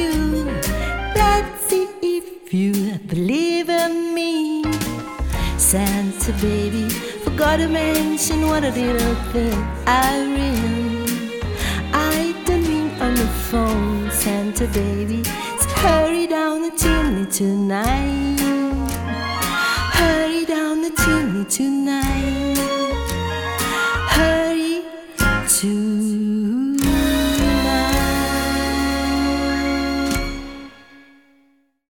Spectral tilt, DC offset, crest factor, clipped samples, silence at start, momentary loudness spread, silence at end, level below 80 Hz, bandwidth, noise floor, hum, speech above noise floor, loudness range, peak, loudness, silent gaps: -4 dB/octave; under 0.1%; 16 dB; under 0.1%; 0 s; 7 LU; 0.95 s; -28 dBFS; 19 kHz; -59 dBFS; none; 40 dB; 2 LU; -2 dBFS; -19 LUFS; none